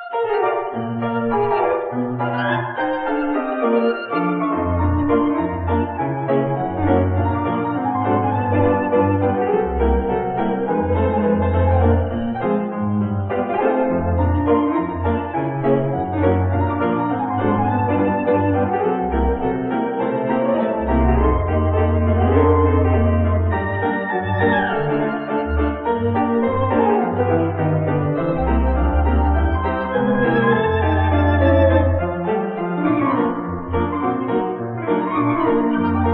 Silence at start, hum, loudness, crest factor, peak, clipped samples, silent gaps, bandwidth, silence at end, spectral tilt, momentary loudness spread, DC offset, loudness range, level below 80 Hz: 0 s; none; -19 LUFS; 16 dB; -2 dBFS; under 0.1%; none; 4.4 kHz; 0 s; -12 dB/octave; 5 LU; under 0.1%; 3 LU; -30 dBFS